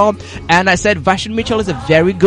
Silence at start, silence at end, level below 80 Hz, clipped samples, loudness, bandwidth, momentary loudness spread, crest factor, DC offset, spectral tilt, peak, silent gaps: 0 s; 0 s; -36 dBFS; under 0.1%; -13 LUFS; 11.5 kHz; 6 LU; 14 dB; under 0.1%; -5 dB/octave; 0 dBFS; none